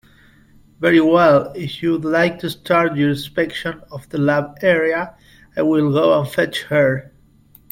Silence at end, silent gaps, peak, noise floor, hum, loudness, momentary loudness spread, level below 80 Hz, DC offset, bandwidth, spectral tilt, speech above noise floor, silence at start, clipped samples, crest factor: 0.7 s; none; 0 dBFS; -50 dBFS; none; -17 LUFS; 14 LU; -54 dBFS; under 0.1%; 16.5 kHz; -6.5 dB/octave; 33 dB; 0.8 s; under 0.1%; 16 dB